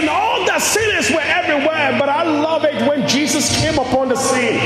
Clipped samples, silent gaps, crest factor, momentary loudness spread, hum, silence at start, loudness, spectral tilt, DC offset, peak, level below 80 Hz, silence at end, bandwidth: under 0.1%; none; 14 dB; 2 LU; none; 0 s; -15 LUFS; -3 dB/octave; under 0.1%; -2 dBFS; -44 dBFS; 0 s; 16 kHz